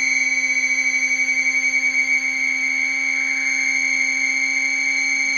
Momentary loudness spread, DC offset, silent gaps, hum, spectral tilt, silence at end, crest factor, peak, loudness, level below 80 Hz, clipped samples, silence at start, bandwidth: 2 LU; under 0.1%; none; none; 1.5 dB/octave; 0 s; 12 dB; -8 dBFS; -17 LUFS; -64 dBFS; under 0.1%; 0 s; 15 kHz